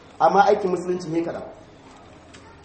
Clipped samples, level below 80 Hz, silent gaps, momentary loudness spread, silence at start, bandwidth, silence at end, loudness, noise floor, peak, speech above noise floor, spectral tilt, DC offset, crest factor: under 0.1%; -58 dBFS; none; 17 LU; 0.2 s; 8.8 kHz; 0.15 s; -21 LUFS; -46 dBFS; -4 dBFS; 26 dB; -6 dB/octave; under 0.1%; 20 dB